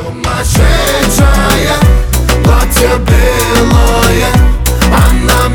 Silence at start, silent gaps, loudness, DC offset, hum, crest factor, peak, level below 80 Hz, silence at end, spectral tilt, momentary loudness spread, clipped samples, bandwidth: 0 s; none; -9 LUFS; under 0.1%; none; 8 dB; 0 dBFS; -10 dBFS; 0 s; -4.5 dB/octave; 3 LU; 0.2%; 19.5 kHz